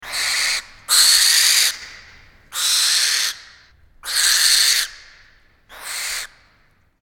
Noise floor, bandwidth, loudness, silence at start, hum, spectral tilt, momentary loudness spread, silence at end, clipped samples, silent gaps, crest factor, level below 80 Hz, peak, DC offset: -58 dBFS; 19 kHz; -15 LUFS; 0 s; none; 4.5 dB/octave; 19 LU; 0.75 s; under 0.1%; none; 20 dB; -54 dBFS; 0 dBFS; under 0.1%